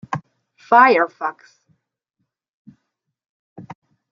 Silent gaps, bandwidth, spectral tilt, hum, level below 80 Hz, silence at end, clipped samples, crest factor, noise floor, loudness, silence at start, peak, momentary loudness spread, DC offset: 2.49-2.65 s, 3.29-3.56 s; 7.2 kHz; -6 dB/octave; none; -72 dBFS; 0.5 s; under 0.1%; 20 dB; -76 dBFS; -16 LUFS; 0.1 s; -2 dBFS; 18 LU; under 0.1%